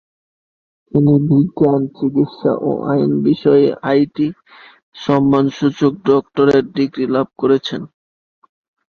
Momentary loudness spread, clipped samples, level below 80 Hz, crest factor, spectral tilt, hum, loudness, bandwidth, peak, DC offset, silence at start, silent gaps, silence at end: 7 LU; under 0.1%; -54 dBFS; 16 dB; -8.5 dB/octave; none; -15 LUFS; 6.8 kHz; 0 dBFS; under 0.1%; 0.95 s; 4.83-4.92 s; 1.05 s